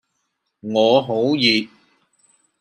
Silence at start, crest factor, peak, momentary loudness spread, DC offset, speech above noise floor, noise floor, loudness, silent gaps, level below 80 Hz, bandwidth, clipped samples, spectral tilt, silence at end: 0.65 s; 18 dB; -2 dBFS; 16 LU; under 0.1%; 56 dB; -73 dBFS; -17 LUFS; none; -70 dBFS; 15.5 kHz; under 0.1%; -5 dB/octave; 0.95 s